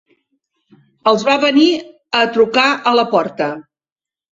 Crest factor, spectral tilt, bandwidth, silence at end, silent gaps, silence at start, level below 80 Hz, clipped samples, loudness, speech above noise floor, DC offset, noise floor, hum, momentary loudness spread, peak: 16 dB; -4 dB/octave; 7.8 kHz; 0.7 s; none; 1.05 s; -62 dBFS; under 0.1%; -14 LUFS; over 76 dB; under 0.1%; under -90 dBFS; none; 10 LU; -2 dBFS